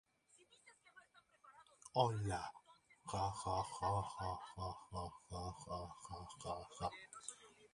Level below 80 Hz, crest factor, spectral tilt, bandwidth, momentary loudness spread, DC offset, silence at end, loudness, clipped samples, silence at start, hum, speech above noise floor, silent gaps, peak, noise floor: -62 dBFS; 26 dB; -5 dB/octave; 11.5 kHz; 25 LU; under 0.1%; 0.05 s; -45 LUFS; under 0.1%; 0.35 s; none; 29 dB; none; -20 dBFS; -73 dBFS